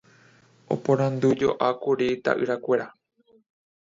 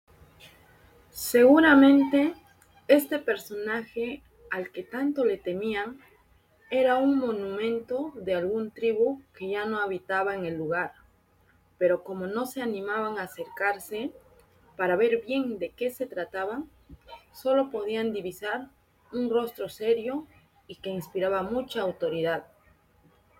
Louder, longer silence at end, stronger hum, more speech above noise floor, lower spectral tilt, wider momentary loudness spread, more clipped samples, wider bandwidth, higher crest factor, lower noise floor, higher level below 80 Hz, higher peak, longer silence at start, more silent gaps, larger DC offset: first, -24 LUFS vs -27 LUFS; first, 1.1 s vs 0.95 s; neither; second, 33 dB vs 37 dB; first, -7 dB/octave vs -5 dB/octave; second, 6 LU vs 13 LU; neither; second, 7.6 kHz vs 17 kHz; about the same, 20 dB vs 22 dB; second, -57 dBFS vs -63 dBFS; about the same, -64 dBFS vs -64 dBFS; about the same, -6 dBFS vs -6 dBFS; first, 0.7 s vs 0.45 s; neither; neither